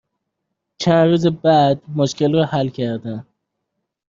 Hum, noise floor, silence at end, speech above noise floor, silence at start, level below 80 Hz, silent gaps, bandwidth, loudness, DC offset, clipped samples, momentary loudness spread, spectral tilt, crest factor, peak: none; -77 dBFS; 0.85 s; 60 dB; 0.8 s; -58 dBFS; none; 7.6 kHz; -17 LUFS; under 0.1%; under 0.1%; 11 LU; -6.5 dB/octave; 16 dB; -2 dBFS